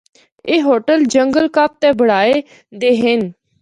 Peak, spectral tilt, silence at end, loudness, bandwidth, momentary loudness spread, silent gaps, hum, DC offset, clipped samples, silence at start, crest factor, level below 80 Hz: -2 dBFS; -4.5 dB/octave; 0.3 s; -14 LUFS; 11 kHz; 6 LU; none; none; under 0.1%; under 0.1%; 0.45 s; 14 dB; -56 dBFS